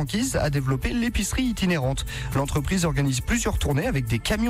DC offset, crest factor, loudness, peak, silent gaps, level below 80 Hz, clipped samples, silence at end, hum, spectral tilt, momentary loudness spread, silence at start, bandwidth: under 0.1%; 10 dB; -25 LUFS; -14 dBFS; none; -32 dBFS; under 0.1%; 0 s; none; -5 dB/octave; 2 LU; 0 s; 16 kHz